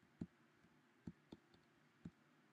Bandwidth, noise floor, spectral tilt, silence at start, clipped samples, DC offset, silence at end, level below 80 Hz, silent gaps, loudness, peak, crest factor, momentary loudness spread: 8.8 kHz; -74 dBFS; -7.5 dB/octave; 0 s; under 0.1%; under 0.1%; 0 s; -80 dBFS; none; -61 LUFS; -34 dBFS; 28 dB; 8 LU